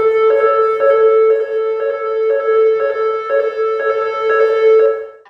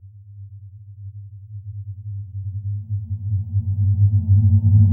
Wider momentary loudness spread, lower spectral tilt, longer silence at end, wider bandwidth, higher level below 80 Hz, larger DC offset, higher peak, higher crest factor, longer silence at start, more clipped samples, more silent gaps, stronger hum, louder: second, 7 LU vs 25 LU; second, -4 dB/octave vs -16 dB/octave; first, 0.2 s vs 0 s; first, 5.2 kHz vs 0.8 kHz; second, -66 dBFS vs -44 dBFS; neither; about the same, -2 dBFS vs 0 dBFS; second, 12 dB vs 20 dB; about the same, 0 s vs 0.05 s; neither; neither; neither; first, -14 LUFS vs -20 LUFS